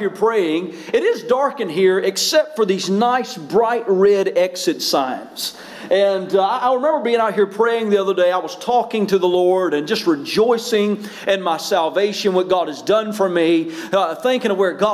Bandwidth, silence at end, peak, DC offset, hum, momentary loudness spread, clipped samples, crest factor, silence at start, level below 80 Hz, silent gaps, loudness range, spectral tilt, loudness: 16 kHz; 0 s; -6 dBFS; under 0.1%; none; 5 LU; under 0.1%; 12 dB; 0 s; -66 dBFS; none; 1 LU; -4 dB/octave; -18 LUFS